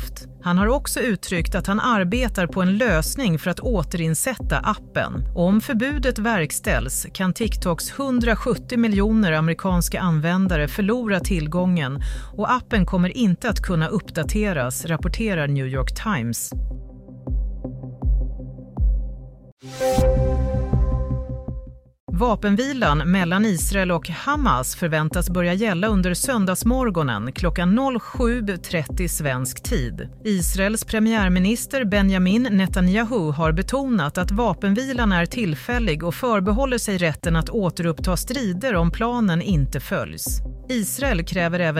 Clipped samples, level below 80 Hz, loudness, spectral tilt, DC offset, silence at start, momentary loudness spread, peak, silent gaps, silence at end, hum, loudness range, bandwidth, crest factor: under 0.1%; -28 dBFS; -22 LUFS; -5.5 dB/octave; under 0.1%; 0 s; 7 LU; -6 dBFS; 19.52-19.57 s, 22.00-22.07 s; 0 s; none; 4 LU; 16 kHz; 14 dB